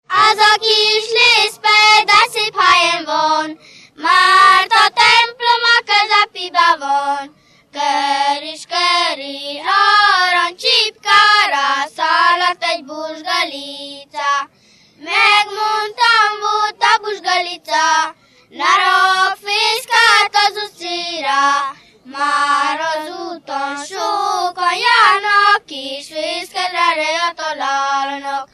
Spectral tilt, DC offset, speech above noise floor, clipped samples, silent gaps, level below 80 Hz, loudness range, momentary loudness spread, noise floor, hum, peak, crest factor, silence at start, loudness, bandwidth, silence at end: 0.5 dB/octave; under 0.1%; 25 dB; under 0.1%; none; -62 dBFS; 6 LU; 13 LU; -42 dBFS; none; 0 dBFS; 14 dB; 0.1 s; -13 LUFS; 14.5 kHz; 0.1 s